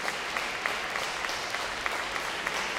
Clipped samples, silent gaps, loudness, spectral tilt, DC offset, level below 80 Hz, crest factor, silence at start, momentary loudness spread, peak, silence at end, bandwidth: under 0.1%; none; -31 LUFS; -1 dB/octave; under 0.1%; -58 dBFS; 20 dB; 0 s; 1 LU; -12 dBFS; 0 s; 16.5 kHz